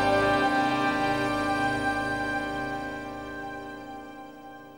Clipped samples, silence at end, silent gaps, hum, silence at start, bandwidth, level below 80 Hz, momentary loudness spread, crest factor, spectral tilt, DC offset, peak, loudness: under 0.1%; 0 s; none; none; 0 s; 16 kHz; -50 dBFS; 18 LU; 16 dB; -5 dB/octave; under 0.1%; -12 dBFS; -27 LUFS